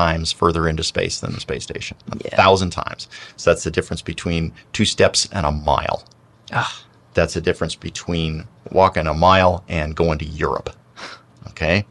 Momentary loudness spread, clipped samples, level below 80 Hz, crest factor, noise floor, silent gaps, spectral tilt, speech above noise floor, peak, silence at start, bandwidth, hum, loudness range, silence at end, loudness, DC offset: 15 LU; under 0.1%; -34 dBFS; 18 dB; -38 dBFS; none; -4.5 dB/octave; 19 dB; -2 dBFS; 0 s; 11.5 kHz; none; 3 LU; 0.05 s; -20 LUFS; under 0.1%